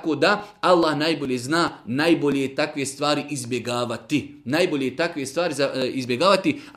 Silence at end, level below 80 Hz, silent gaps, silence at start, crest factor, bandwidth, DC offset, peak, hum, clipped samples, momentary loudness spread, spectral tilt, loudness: 0.05 s; -62 dBFS; none; 0 s; 18 dB; 15.5 kHz; under 0.1%; -4 dBFS; none; under 0.1%; 7 LU; -4.5 dB/octave; -22 LUFS